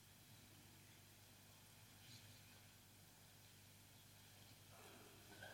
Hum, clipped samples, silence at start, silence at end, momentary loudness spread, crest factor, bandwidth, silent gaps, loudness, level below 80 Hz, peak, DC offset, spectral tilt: 50 Hz at -70 dBFS; under 0.1%; 0 s; 0 s; 3 LU; 20 dB; 16.5 kHz; none; -64 LUFS; -82 dBFS; -44 dBFS; under 0.1%; -3 dB/octave